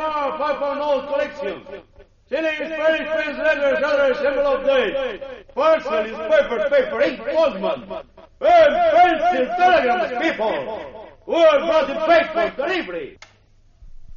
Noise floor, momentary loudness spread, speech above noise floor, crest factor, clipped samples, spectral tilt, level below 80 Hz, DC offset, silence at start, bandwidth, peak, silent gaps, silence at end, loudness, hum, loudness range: -53 dBFS; 15 LU; 34 dB; 14 dB; under 0.1%; -1 dB/octave; -48 dBFS; under 0.1%; 0 s; 7.2 kHz; -4 dBFS; none; 0 s; -19 LUFS; none; 4 LU